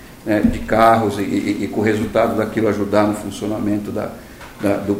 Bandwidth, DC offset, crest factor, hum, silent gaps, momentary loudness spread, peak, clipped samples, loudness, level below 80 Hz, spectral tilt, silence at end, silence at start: 16 kHz; under 0.1%; 18 dB; none; none; 11 LU; 0 dBFS; under 0.1%; -18 LUFS; -38 dBFS; -6.5 dB/octave; 0 s; 0 s